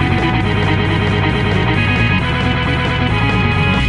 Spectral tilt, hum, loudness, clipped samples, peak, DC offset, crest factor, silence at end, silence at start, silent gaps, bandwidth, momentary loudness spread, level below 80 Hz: -7 dB/octave; none; -15 LUFS; under 0.1%; -2 dBFS; under 0.1%; 12 dB; 0 s; 0 s; none; 10.5 kHz; 2 LU; -26 dBFS